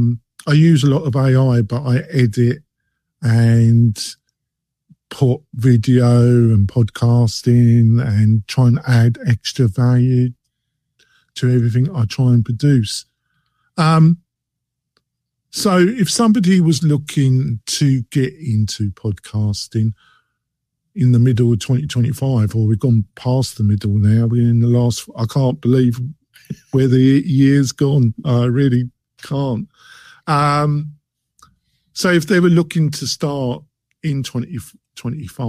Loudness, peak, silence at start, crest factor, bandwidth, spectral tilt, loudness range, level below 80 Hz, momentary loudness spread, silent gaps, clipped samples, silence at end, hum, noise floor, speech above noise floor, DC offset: -16 LUFS; -2 dBFS; 0 s; 14 dB; 13.5 kHz; -7 dB/octave; 5 LU; -48 dBFS; 13 LU; none; under 0.1%; 0 s; none; -79 dBFS; 65 dB; under 0.1%